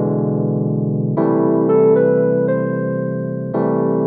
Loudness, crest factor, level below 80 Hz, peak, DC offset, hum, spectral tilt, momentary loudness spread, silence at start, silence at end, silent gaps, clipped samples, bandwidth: -17 LUFS; 14 dB; -64 dBFS; -2 dBFS; under 0.1%; none; -14.5 dB/octave; 8 LU; 0 s; 0 s; none; under 0.1%; 2.8 kHz